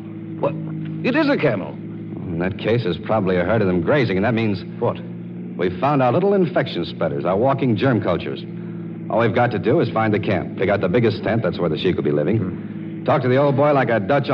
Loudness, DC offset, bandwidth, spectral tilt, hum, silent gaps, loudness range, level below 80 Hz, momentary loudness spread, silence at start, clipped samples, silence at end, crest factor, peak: -20 LUFS; under 0.1%; 6.2 kHz; -9.5 dB/octave; none; none; 1 LU; -54 dBFS; 13 LU; 0 s; under 0.1%; 0 s; 14 dB; -4 dBFS